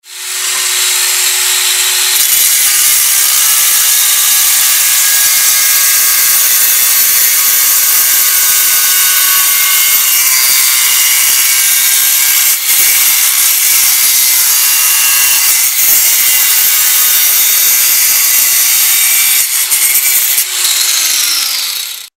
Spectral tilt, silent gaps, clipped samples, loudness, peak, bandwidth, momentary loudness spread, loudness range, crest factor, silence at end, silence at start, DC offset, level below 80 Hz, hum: 4.5 dB/octave; none; 0.2%; -6 LUFS; 0 dBFS; over 20 kHz; 3 LU; 1 LU; 10 dB; 0.1 s; 0.05 s; under 0.1%; -56 dBFS; none